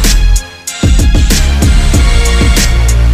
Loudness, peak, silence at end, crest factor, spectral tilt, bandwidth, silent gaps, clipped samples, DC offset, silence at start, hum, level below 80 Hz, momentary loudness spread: -10 LUFS; 0 dBFS; 0 s; 6 dB; -4 dB/octave; 16 kHz; none; under 0.1%; under 0.1%; 0 s; none; -8 dBFS; 5 LU